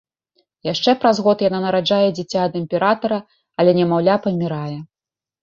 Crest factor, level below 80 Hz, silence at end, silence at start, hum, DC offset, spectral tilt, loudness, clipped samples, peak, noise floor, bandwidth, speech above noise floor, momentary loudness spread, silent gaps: 16 dB; -60 dBFS; 0.55 s; 0.65 s; none; under 0.1%; -6.5 dB/octave; -18 LUFS; under 0.1%; -2 dBFS; under -90 dBFS; 7.4 kHz; over 73 dB; 11 LU; none